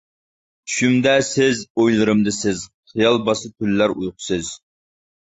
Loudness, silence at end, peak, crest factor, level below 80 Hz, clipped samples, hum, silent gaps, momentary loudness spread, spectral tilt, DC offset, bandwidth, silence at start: -19 LUFS; 0.65 s; -2 dBFS; 18 dB; -52 dBFS; under 0.1%; none; 1.70-1.75 s, 2.74-2.83 s; 12 LU; -4.5 dB/octave; under 0.1%; 8.2 kHz; 0.65 s